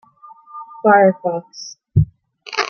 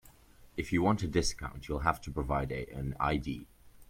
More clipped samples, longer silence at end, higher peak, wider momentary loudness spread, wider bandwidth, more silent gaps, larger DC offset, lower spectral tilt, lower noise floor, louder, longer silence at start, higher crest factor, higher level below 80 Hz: neither; about the same, 0 s vs 0.05 s; first, -2 dBFS vs -12 dBFS; first, 24 LU vs 12 LU; second, 7 kHz vs 16.5 kHz; neither; neither; about the same, -6 dB/octave vs -5.5 dB/octave; second, -44 dBFS vs -57 dBFS; first, -17 LUFS vs -33 LUFS; first, 0.55 s vs 0.05 s; second, 16 dB vs 22 dB; about the same, -42 dBFS vs -44 dBFS